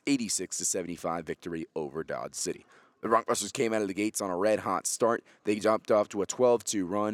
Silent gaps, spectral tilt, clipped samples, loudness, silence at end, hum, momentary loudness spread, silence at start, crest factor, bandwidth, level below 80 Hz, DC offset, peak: none; -3.5 dB/octave; under 0.1%; -30 LUFS; 0 s; none; 10 LU; 0.05 s; 20 dB; 17.5 kHz; -74 dBFS; under 0.1%; -10 dBFS